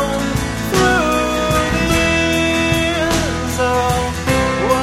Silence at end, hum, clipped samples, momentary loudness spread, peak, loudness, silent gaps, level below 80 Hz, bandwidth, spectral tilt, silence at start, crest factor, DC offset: 0 s; none; under 0.1%; 4 LU; -2 dBFS; -16 LUFS; none; -28 dBFS; 16.5 kHz; -4.5 dB/octave; 0 s; 14 dB; under 0.1%